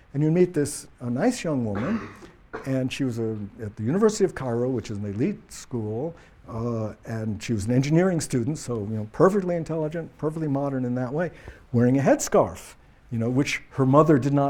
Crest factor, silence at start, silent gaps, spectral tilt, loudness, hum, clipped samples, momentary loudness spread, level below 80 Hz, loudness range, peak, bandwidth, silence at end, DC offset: 20 dB; 0.15 s; none; -6.5 dB/octave; -25 LUFS; none; under 0.1%; 12 LU; -52 dBFS; 4 LU; -4 dBFS; 17 kHz; 0 s; under 0.1%